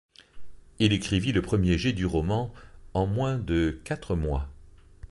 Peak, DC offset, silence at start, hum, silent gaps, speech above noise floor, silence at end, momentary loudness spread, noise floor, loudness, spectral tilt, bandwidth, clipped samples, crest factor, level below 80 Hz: -6 dBFS; under 0.1%; 0.35 s; none; none; 25 dB; 0.05 s; 9 LU; -50 dBFS; -27 LUFS; -6.5 dB/octave; 11.5 kHz; under 0.1%; 22 dB; -38 dBFS